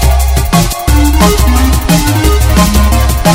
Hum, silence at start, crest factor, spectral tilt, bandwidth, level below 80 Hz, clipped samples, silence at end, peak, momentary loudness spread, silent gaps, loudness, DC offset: none; 0 s; 8 dB; -5 dB/octave; 16.5 kHz; -10 dBFS; 0.4%; 0 s; 0 dBFS; 2 LU; none; -9 LUFS; 0.5%